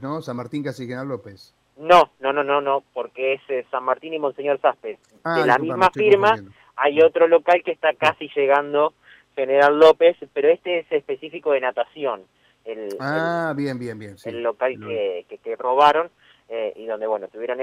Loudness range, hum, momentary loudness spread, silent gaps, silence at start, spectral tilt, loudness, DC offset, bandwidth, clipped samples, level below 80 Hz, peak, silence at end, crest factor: 8 LU; none; 16 LU; none; 0 s; -5.5 dB/octave; -20 LUFS; under 0.1%; 11.5 kHz; under 0.1%; -64 dBFS; -4 dBFS; 0 s; 16 dB